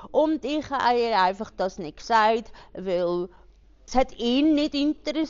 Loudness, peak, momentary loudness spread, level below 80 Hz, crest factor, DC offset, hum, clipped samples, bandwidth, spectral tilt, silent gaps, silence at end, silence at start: -24 LUFS; -8 dBFS; 9 LU; -48 dBFS; 16 dB; under 0.1%; none; under 0.1%; 7.4 kHz; -2.5 dB/octave; none; 0 s; 0 s